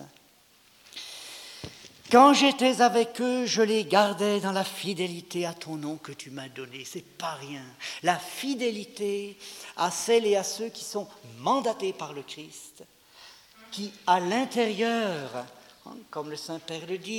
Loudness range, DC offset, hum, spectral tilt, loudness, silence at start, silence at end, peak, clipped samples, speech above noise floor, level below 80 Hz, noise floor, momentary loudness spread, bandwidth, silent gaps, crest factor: 11 LU; under 0.1%; none; -3.5 dB/octave; -26 LUFS; 0 s; 0 s; -4 dBFS; under 0.1%; 33 dB; -74 dBFS; -60 dBFS; 19 LU; 18 kHz; none; 24 dB